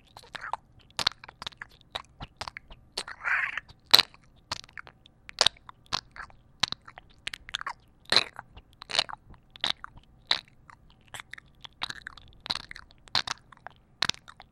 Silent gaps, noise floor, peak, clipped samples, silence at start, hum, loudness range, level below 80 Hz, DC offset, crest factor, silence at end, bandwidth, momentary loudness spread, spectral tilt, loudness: none; -55 dBFS; 0 dBFS; under 0.1%; 0.35 s; none; 9 LU; -58 dBFS; under 0.1%; 34 dB; 0.45 s; 16 kHz; 22 LU; -0.5 dB/octave; -29 LUFS